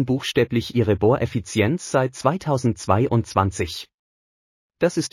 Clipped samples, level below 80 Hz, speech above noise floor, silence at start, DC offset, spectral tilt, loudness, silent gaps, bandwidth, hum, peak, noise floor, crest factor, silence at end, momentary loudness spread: under 0.1%; -48 dBFS; over 69 dB; 0 s; under 0.1%; -6 dB/octave; -22 LUFS; 3.94-4.70 s; 14.5 kHz; none; -4 dBFS; under -90 dBFS; 18 dB; 0.05 s; 5 LU